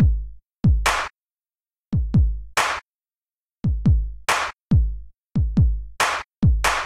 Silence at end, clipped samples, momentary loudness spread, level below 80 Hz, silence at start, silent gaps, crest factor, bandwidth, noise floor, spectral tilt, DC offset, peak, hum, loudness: 0 s; under 0.1%; 9 LU; -26 dBFS; 0 s; none; 16 dB; 14.5 kHz; under -90 dBFS; -5 dB/octave; under 0.1%; -4 dBFS; none; -22 LUFS